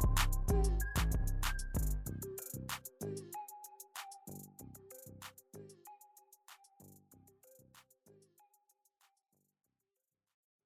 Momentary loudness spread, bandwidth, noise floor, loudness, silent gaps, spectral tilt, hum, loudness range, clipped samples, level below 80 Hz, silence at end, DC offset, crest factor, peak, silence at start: 25 LU; 16 kHz; under -90 dBFS; -40 LUFS; none; -4.5 dB/octave; none; 24 LU; under 0.1%; -42 dBFS; 2.85 s; under 0.1%; 20 dB; -20 dBFS; 0 s